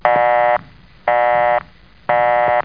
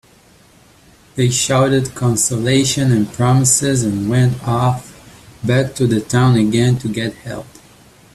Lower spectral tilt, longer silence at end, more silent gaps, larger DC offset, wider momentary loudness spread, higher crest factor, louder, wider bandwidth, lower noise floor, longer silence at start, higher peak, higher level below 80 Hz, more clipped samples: first, -7.5 dB/octave vs -5 dB/octave; second, 0 s vs 0.7 s; neither; first, 0.3% vs under 0.1%; second, 8 LU vs 11 LU; about the same, 16 dB vs 16 dB; about the same, -16 LUFS vs -15 LUFS; second, 5.2 kHz vs 13.5 kHz; second, -43 dBFS vs -48 dBFS; second, 0.05 s vs 1.15 s; about the same, 0 dBFS vs 0 dBFS; about the same, -50 dBFS vs -46 dBFS; neither